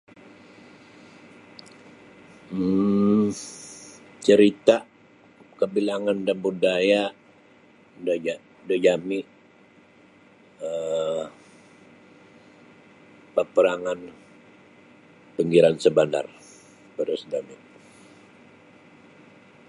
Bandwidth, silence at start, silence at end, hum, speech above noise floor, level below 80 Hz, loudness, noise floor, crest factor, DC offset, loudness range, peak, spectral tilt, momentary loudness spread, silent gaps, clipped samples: 11.5 kHz; 2.5 s; 2.15 s; none; 33 dB; -66 dBFS; -23 LUFS; -54 dBFS; 22 dB; under 0.1%; 11 LU; -2 dBFS; -5.5 dB/octave; 22 LU; none; under 0.1%